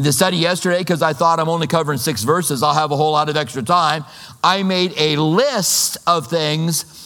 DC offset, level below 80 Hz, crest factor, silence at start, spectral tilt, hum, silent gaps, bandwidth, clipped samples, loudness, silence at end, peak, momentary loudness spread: under 0.1%; -58 dBFS; 16 dB; 0 s; -4 dB/octave; none; none; 19 kHz; under 0.1%; -17 LUFS; 0 s; 0 dBFS; 4 LU